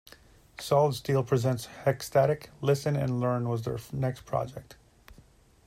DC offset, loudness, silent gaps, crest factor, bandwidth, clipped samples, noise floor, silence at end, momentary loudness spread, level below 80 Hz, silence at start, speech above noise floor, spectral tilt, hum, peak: under 0.1%; -29 LUFS; none; 18 dB; 16 kHz; under 0.1%; -58 dBFS; 0.55 s; 8 LU; -58 dBFS; 0.6 s; 30 dB; -6.5 dB/octave; none; -10 dBFS